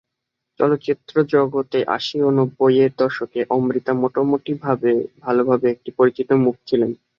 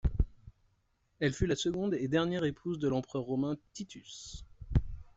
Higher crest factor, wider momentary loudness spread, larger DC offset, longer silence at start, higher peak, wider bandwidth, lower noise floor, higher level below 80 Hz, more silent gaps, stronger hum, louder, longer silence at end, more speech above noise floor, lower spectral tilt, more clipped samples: about the same, 16 dB vs 20 dB; second, 5 LU vs 15 LU; neither; first, 0.6 s vs 0.05 s; first, -2 dBFS vs -14 dBFS; second, 7 kHz vs 8.2 kHz; first, -80 dBFS vs -74 dBFS; second, -64 dBFS vs -42 dBFS; neither; neither; first, -19 LUFS vs -34 LUFS; about the same, 0.25 s vs 0.15 s; first, 61 dB vs 41 dB; first, -8 dB/octave vs -6 dB/octave; neither